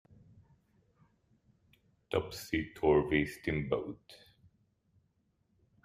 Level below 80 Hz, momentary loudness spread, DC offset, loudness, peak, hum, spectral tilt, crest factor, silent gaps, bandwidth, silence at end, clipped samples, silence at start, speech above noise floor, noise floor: -58 dBFS; 8 LU; under 0.1%; -33 LUFS; -14 dBFS; none; -6.5 dB/octave; 22 dB; none; 15 kHz; 1.7 s; under 0.1%; 2.1 s; 43 dB; -76 dBFS